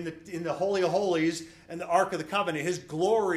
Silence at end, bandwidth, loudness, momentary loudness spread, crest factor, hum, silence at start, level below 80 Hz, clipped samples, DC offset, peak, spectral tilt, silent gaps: 0 s; 14.5 kHz; -28 LUFS; 11 LU; 18 dB; none; 0 s; -66 dBFS; under 0.1%; under 0.1%; -10 dBFS; -5 dB/octave; none